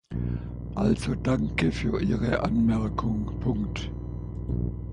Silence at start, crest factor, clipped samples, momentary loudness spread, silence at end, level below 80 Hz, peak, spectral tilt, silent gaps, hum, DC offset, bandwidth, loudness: 0.1 s; 16 dB; under 0.1%; 10 LU; 0 s; -36 dBFS; -10 dBFS; -7.5 dB/octave; none; 60 Hz at -35 dBFS; under 0.1%; 11 kHz; -28 LUFS